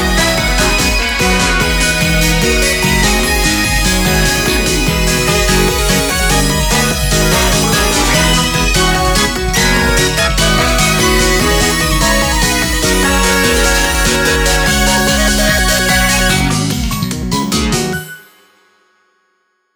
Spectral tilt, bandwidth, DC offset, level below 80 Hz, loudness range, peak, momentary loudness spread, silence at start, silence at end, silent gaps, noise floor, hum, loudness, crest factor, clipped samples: -3 dB/octave; over 20 kHz; under 0.1%; -20 dBFS; 2 LU; 0 dBFS; 2 LU; 0 s; 1.55 s; none; -62 dBFS; none; -11 LUFS; 12 dB; under 0.1%